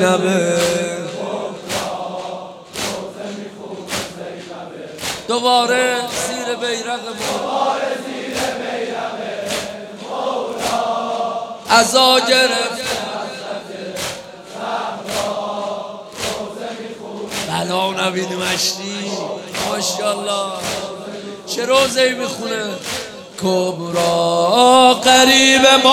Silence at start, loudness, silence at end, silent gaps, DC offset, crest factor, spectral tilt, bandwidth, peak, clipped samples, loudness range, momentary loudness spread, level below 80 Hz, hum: 0 s; -17 LUFS; 0 s; none; under 0.1%; 18 dB; -2.5 dB/octave; 17 kHz; 0 dBFS; under 0.1%; 9 LU; 18 LU; -56 dBFS; none